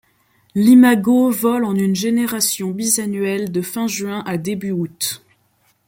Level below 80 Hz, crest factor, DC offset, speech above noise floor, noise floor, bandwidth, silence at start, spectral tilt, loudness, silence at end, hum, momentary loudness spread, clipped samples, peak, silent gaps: -62 dBFS; 16 dB; under 0.1%; 44 dB; -61 dBFS; 17 kHz; 0.55 s; -4.5 dB/octave; -17 LUFS; 0.7 s; none; 12 LU; under 0.1%; -2 dBFS; none